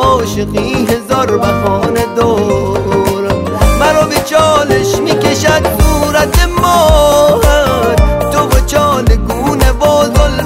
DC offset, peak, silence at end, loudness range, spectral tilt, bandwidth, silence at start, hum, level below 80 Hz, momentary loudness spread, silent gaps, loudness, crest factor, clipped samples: under 0.1%; 0 dBFS; 0 s; 3 LU; -5 dB/octave; 16.5 kHz; 0 s; none; -16 dBFS; 5 LU; none; -10 LUFS; 10 dB; under 0.1%